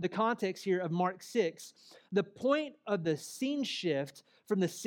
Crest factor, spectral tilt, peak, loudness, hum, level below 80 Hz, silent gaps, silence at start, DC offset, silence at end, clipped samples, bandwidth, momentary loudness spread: 18 dB; -5.5 dB/octave; -16 dBFS; -34 LUFS; none; -86 dBFS; none; 0 s; under 0.1%; 0 s; under 0.1%; 18 kHz; 5 LU